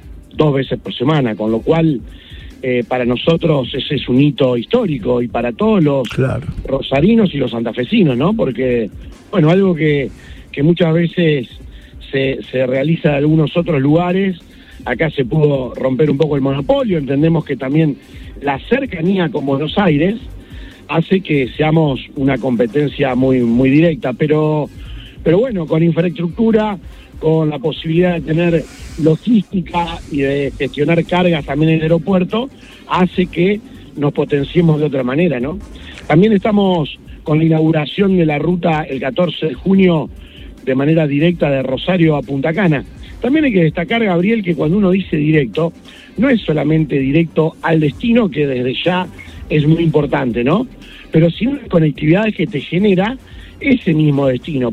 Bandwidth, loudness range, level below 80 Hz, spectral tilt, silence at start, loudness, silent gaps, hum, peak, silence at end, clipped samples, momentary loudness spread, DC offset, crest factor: 8.2 kHz; 2 LU; -38 dBFS; -8.5 dB/octave; 0.05 s; -15 LUFS; none; none; 0 dBFS; 0 s; under 0.1%; 8 LU; under 0.1%; 14 dB